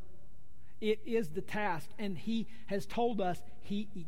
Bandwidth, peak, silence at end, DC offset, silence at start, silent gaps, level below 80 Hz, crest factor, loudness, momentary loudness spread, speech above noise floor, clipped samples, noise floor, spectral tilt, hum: 16 kHz; -20 dBFS; 0 s; 2%; 0 s; none; -60 dBFS; 16 dB; -37 LUFS; 7 LU; 24 dB; under 0.1%; -60 dBFS; -6 dB/octave; none